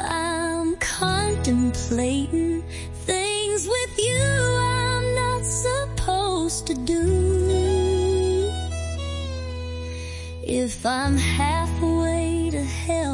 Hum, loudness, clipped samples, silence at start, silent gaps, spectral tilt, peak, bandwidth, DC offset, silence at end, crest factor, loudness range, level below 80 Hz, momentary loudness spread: none; -23 LUFS; under 0.1%; 0 s; none; -4.5 dB/octave; -8 dBFS; 11.5 kHz; under 0.1%; 0 s; 14 dB; 3 LU; -36 dBFS; 9 LU